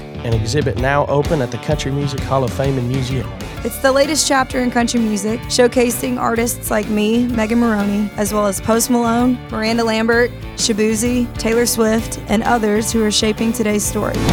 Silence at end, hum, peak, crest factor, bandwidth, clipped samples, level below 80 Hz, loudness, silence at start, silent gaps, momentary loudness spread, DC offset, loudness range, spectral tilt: 0 s; none; 0 dBFS; 16 dB; 19.5 kHz; under 0.1%; -34 dBFS; -17 LUFS; 0 s; none; 6 LU; under 0.1%; 2 LU; -4.5 dB/octave